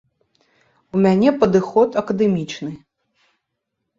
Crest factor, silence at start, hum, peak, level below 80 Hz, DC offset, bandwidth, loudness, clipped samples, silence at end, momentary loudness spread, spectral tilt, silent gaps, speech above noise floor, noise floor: 18 dB; 0.95 s; none; -2 dBFS; -56 dBFS; under 0.1%; 7.6 kHz; -18 LUFS; under 0.1%; 1.25 s; 13 LU; -7.5 dB/octave; none; 60 dB; -77 dBFS